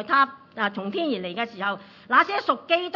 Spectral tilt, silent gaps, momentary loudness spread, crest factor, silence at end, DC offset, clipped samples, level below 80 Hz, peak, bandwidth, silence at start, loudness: -5.5 dB/octave; none; 9 LU; 20 dB; 0 s; under 0.1%; under 0.1%; -76 dBFS; -4 dBFS; 6 kHz; 0 s; -24 LUFS